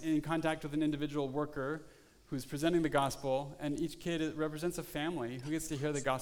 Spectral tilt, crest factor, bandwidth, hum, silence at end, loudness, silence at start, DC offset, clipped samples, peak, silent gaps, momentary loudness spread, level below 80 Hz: -5.5 dB/octave; 18 dB; 19 kHz; none; 0 s; -36 LUFS; 0 s; under 0.1%; under 0.1%; -16 dBFS; none; 7 LU; -58 dBFS